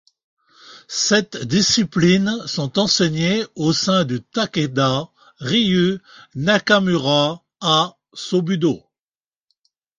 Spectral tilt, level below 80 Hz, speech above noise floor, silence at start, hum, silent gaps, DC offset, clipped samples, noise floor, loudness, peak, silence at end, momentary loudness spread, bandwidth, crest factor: -4.5 dB/octave; -54 dBFS; over 72 dB; 0.65 s; none; none; under 0.1%; under 0.1%; under -90 dBFS; -18 LUFS; -2 dBFS; 1.2 s; 9 LU; 9.2 kHz; 18 dB